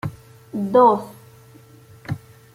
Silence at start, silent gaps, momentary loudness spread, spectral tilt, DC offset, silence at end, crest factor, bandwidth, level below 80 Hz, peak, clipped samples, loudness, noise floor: 0.05 s; none; 22 LU; -8 dB/octave; under 0.1%; 0.4 s; 20 dB; 16 kHz; -58 dBFS; -4 dBFS; under 0.1%; -17 LUFS; -47 dBFS